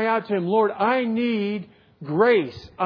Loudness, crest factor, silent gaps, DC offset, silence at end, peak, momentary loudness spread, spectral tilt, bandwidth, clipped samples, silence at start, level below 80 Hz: -22 LUFS; 16 dB; none; under 0.1%; 0 s; -6 dBFS; 13 LU; -8.5 dB/octave; 5.4 kHz; under 0.1%; 0 s; -62 dBFS